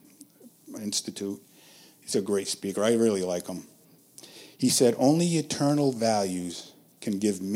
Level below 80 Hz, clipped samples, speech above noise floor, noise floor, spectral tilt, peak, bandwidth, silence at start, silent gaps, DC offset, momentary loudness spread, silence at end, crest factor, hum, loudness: -72 dBFS; under 0.1%; 28 dB; -54 dBFS; -4.5 dB/octave; -8 dBFS; 16.5 kHz; 0.45 s; none; under 0.1%; 19 LU; 0 s; 18 dB; none; -26 LUFS